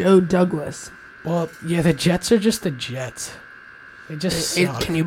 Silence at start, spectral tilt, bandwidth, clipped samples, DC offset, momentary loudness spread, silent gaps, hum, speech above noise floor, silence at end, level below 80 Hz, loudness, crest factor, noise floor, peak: 0 s; -5 dB/octave; 16.5 kHz; under 0.1%; under 0.1%; 21 LU; none; none; 23 dB; 0 s; -48 dBFS; -21 LUFS; 18 dB; -43 dBFS; -2 dBFS